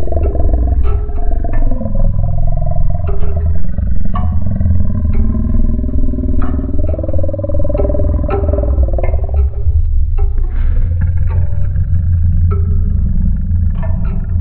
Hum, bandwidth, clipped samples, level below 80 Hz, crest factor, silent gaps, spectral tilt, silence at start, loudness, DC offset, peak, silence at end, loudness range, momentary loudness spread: none; 2.8 kHz; under 0.1%; -14 dBFS; 10 dB; none; -14 dB/octave; 0 s; -16 LUFS; under 0.1%; 0 dBFS; 0 s; 2 LU; 4 LU